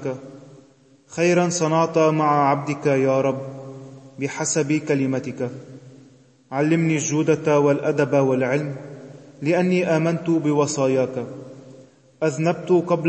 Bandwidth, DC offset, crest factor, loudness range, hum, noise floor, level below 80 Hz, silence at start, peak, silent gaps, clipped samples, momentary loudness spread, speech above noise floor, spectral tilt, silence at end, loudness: 8.8 kHz; under 0.1%; 16 dB; 3 LU; none; -53 dBFS; -68 dBFS; 0 s; -6 dBFS; none; under 0.1%; 17 LU; 33 dB; -6 dB/octave; 0 s; -21 LUFS